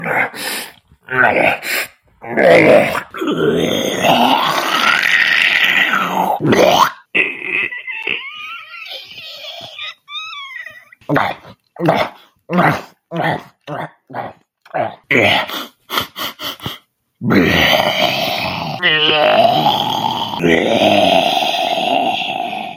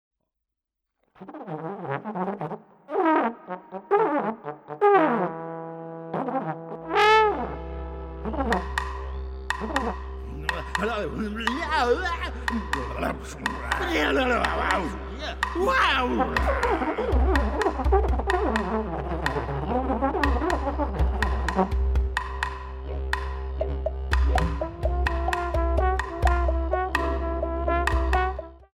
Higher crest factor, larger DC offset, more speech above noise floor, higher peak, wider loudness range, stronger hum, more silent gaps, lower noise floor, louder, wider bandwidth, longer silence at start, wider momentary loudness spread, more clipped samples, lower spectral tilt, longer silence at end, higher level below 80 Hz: second, 16 dB vs 22 dB; neither; second, 27 dB vs 52 dB; first, 0 dBFS vs -4 dBFS; first, 9 LU vs 5 LU; neither; neither; second, -39 dBFS vs -84 dBFS; first, -14 LUFS vs -26 LUFS; first, 16.5 kHz vs 12 kHz; second, 0 s vs 1.2 s; first, 17 LU vs 13 LU; neither; second, -4 dB/octave vs -6 dB/octave; about the same, 0 s vs 0.1 s; second, -52 dBFS vs -30 dBFS